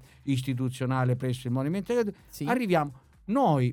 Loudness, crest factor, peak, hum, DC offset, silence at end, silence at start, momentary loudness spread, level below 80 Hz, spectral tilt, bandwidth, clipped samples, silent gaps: -28 LUFS; 16 dB; -12 dBFS; none; under 0.1%; 0 s; 0.25 s; 8 LU; -60 dBFS; -7.5 dB/octave; 17 kHz; under 0.1%; none